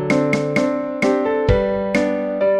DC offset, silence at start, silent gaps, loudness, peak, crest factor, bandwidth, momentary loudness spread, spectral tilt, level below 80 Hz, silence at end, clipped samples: under 0.1%; 0 s; none; -19 LUFS; -2 dBFS; 16 dB; 12 kHz; 2 LU; -6.5 dB/octave; -34 dBFS; 0 s; under 0.1%